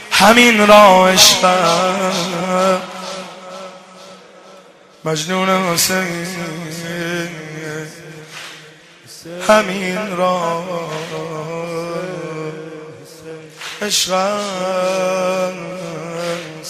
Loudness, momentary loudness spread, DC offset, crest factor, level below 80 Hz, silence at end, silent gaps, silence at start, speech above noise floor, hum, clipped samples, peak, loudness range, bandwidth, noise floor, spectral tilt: -14 LUFS; 24 LU; under 0.1%; 16 dB; -52 dBFS; 0 s; none; 0 s; 29 dB; none; under 0.1%; 0 dBFS; 12 LU; 15 kHz; -43 dBFS; -3 dB/octave